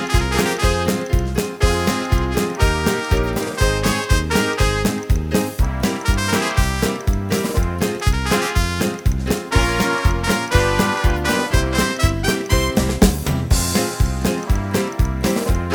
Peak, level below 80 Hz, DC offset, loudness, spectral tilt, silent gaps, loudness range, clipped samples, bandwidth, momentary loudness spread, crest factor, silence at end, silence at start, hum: 0 dBFS; -22 dBFS; under 0.1%; -19 LUFS; -5 dB/octave; none; 2 LU; under 0.1%; over 20 kHz; 4 LU; 18 dB; 0 s; 0 s; none